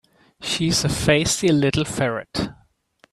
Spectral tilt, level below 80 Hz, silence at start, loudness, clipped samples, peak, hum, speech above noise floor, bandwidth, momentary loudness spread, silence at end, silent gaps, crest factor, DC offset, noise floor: -4 dB/octave; -44 dBFS; 0.4 s; -21 LUFS; under 0.1%; -2 dBFS; none; 38 dB; 14.5 kHz; 10 LU; 0.6 s; none; 20 dB; under 0.1%; -59 dBFS